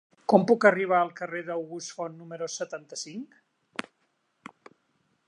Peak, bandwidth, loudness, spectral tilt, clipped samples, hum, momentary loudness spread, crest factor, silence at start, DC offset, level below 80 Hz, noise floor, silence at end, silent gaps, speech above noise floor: -4 dBFS; 11 kHz; -27 LUFS; -5 dB/octave; under 0.1%; none; 18 LU; 26 dB; 0.3 s; under 0.1%; -80 dBFS; -74 dBFS; 1.45 s; none; 47 dB